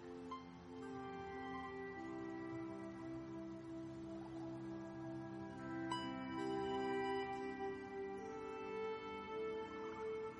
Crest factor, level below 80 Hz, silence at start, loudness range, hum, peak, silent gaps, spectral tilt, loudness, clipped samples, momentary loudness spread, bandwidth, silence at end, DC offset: 18 dB; -72 dBFS; 0 s; 5 LU; none; -28 dBFS; none; -6 dB/octave; -47 LUFS; under 0.1%; 8 LU; 10.5 kHz; 0 s; under 0.1%